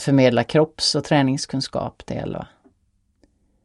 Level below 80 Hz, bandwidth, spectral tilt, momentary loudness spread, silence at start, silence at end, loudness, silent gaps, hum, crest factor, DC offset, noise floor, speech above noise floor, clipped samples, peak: -52 dBFS; 11.5 kHz; -5 dB/octave; 14 LU; 0 s; 1.2 s; -21 LUFS; none; none; 18 dB; under 0.1%; -66 dBFS; 46 dB; under 0.1%; -4 dBFS